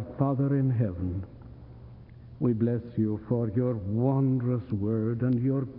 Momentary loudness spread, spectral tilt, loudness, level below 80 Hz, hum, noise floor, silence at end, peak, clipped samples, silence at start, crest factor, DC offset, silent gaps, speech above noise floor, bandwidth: 19 LU; -14 dB/octave; -28 LUFS; -56 dBFS; none; -47 dBFS; 0 s; -10 dBFS; under 0.1%; 0 s; 16 dB; under 0.1%; none; 20 dB; 2.9 kHz